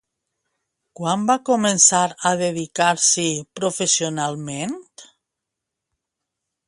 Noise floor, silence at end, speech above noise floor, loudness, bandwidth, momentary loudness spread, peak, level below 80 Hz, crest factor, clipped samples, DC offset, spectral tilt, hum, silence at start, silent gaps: -83 dBFS; 1.65 s; 63 dB; -19 LUFS; 11.5 kHz; 14 LU; -2 dBFS; -68 dBFS; 22 dB; under 0.1%; under 0.1%; -2.5 dB/octave; none; 1 s; none